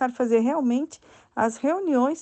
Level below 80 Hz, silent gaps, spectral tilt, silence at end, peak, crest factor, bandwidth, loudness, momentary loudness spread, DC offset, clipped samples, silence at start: -68 dBFS; none; -5.5 dB/octave; 0 s; -10 dBFS; 14 dB; 8.8 kHz; -24 LUFS; 9 LU; under 0.1%; under 0.1%; 0 s